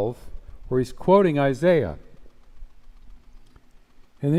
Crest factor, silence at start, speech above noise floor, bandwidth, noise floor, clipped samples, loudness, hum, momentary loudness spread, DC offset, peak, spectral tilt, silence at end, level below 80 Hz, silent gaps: 18 dB; 0 s; 30 dB; 12.5 kHz; -50 dBFS; under 0.1%; -22 LUFS; none; 16 LU; under 0.1%; -6 dBFS; -8 dB/octave; 0 s; -44 dBFS; none